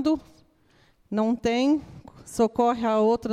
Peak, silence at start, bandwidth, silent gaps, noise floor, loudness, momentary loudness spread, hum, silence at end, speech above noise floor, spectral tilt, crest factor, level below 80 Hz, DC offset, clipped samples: -10 dBFS; 0 s; 13 kHz; none; -61 dBFS; -24 LUFS; 9 LU; none; 0 s; 38 dB; -5.5 dB/octave; 16 dB; -56 dBFS; under 0.1%; under 0.1%